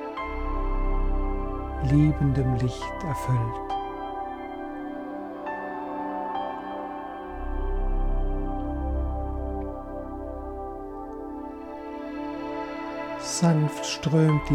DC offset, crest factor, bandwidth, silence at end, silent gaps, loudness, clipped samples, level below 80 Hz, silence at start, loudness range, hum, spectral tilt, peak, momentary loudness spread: under 0.1%; 16 dB; 12.5 kHz; 0 s; none; -29 LUFS; under 0.1%; -32 dBFS; 0 s; 8 LU; none; -6.5 dB/octave; -10 dBFS; 14 LU